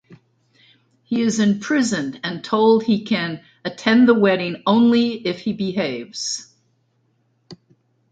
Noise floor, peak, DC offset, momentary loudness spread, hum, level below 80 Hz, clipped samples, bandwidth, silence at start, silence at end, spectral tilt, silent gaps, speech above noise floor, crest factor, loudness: -65 dBFS; -2 dBFS; under 0.1%; 12 LU; none; -62 dBFS; under 0.1%; 9.2 kHz; 0.1 s; 0.6 s; -5 dB/octave; none; 46 dB; 20 dB; -19 LUFS